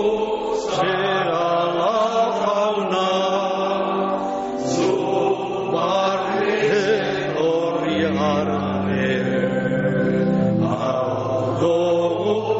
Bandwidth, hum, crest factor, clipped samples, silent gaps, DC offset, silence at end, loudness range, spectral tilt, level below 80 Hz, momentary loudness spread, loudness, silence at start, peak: 8 kHz; none; 12 dB; under 0.1%; none; under 0.1%; 0 s; 1 LU; -4.5 dB/octave; -54 dBFS; 3 LU; -20 LUFS; 0 s; -8 dBFS